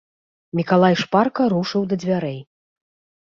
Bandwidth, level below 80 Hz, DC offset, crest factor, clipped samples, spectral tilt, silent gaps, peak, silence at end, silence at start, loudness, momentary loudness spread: 7.2 kHz; -60 dBFS; under 0.1%; 18 dB; under 0.1%; -7 dB/octave; none; -2 dBFS; 0.8 s; 0.55 s; -20 LUFS; 12 LU